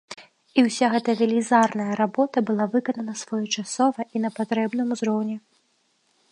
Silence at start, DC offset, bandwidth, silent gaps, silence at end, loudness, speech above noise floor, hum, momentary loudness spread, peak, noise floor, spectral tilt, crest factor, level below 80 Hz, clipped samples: 0.1 s; under 0.1%; 11 kHz; none; 0.9 s; -23 LUFS; 45 dB; none; 9 LU; -4 dBFS; -67 dBFS; -4.5 dB/octave; 20 dB; -76 dBFS; under 0.1%